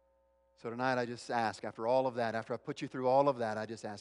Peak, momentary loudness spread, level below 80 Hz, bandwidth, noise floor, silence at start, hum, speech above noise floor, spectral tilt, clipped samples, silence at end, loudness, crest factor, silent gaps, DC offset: -16 dBFS; 12 LU; -78 dBFS; 11 kHz; -72 dBFS; 0.65 s; none; 38 dB; -5.5 dB/octave; under 0.1%; 0 s; -34 LUFS; 20 dB; none; under 0.1%